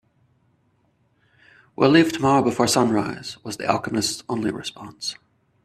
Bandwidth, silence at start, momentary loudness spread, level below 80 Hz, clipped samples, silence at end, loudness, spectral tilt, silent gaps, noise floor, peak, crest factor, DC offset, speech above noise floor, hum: 14.5 kHz; 1.8 s; 16 LU; -60 dBFS; under 0.1%; 0.5 s; -21 LUFS; -4.5 dB/octave; none; -65 dBFS; -2 dBFS; 22 dB; under 0.1%; 44 dB; none